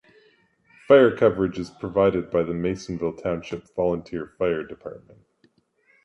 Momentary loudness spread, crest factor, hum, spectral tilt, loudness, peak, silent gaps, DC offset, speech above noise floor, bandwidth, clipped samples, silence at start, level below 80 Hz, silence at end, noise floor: 16 LU; 22 dB; none; -7 dB/octave; -23 LUFS; -2 dBFS; none; under 0.1%; 41 dB; 8.2 kHz; under 0.1%; 0.9 s; -52 dBFS; 1.05 s; -64 dBFS